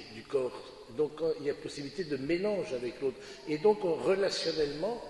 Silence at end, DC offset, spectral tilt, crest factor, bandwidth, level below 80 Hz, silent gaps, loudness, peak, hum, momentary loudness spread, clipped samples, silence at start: 0 s; under 0.1%; -5 dB/octave; 18 dB; 11.5 kHz; -62 dBFS; none; -33 LUFS; -14 dBFS; none; 10 LU; under 0.1%; 0 s